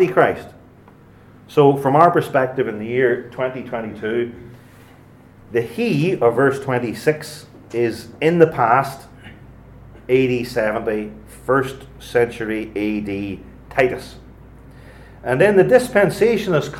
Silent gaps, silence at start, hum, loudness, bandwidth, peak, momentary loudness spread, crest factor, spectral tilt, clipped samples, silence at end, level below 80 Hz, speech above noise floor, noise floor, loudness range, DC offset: none; 0 s; none; -18 LUFS; 16 kHz; 0 dBFS; 16 LU; 20 dB; -6.5 dB/octave; under 0.1%; 0 s; -48 dBFS; 28 dB; -46 dBFS; 5 LU; under 0.1%